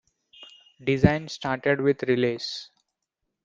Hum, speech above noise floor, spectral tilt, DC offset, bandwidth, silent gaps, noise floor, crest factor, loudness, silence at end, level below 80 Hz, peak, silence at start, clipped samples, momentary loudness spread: none; 58 dB; -6.5 dB/octave; under 0.1%; 7.6 kHz; none; -82 dBFS; 24 dB; -25 LUFS; 0.8 s; -50 dBFS; -2 dBFS; 0.4 s; under 0.1%; 11 LU